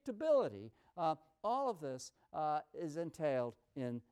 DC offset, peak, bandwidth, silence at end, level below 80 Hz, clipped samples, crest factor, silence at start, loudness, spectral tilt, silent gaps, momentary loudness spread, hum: under 0.1%; -24 dBFS; 13 kHz; 0.1 s; -80 dBFS; under 0.1%; 16 dB; 0.05 s; -39 LUFS; -6 dB/octave; none; 12 LU; none